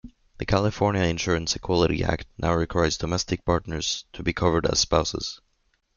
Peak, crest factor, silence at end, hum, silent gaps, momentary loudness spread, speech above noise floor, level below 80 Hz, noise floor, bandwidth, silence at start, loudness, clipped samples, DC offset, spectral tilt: -4 dBFS; 20 dB; 0.6 s; none; none; 7 LU; 45 dB; -40 dBFS; -70 dBFS; 7.4 kHz; 0.05 s; -25 LUFS; under 0.1%; under 0.1%; -4.5 dB/octave